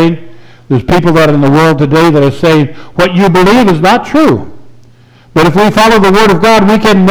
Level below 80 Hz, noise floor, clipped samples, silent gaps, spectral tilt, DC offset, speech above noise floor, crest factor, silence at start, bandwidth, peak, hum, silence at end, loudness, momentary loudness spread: -32 dBFS; -39 dBFS; under 0.1%; none; -6 dB/octave; under 0.1%; 33 dB; 6 dB; 0 s; over 20 kHz; 0 dBFS; none; 0 s; -7 LUFS; 7 LU